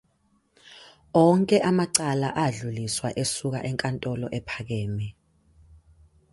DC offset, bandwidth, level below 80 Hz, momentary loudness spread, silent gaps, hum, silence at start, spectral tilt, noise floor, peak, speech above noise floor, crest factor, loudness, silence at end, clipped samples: under 0.1%; 12 kHz; -56 dBFS; 12 LU; none; none; 0.7 s; -5 dB/octave; -67 dBFS; -4 dBFS; 43 dB; 22 dB; -25 LUFS; 1.2 s; under 0.1%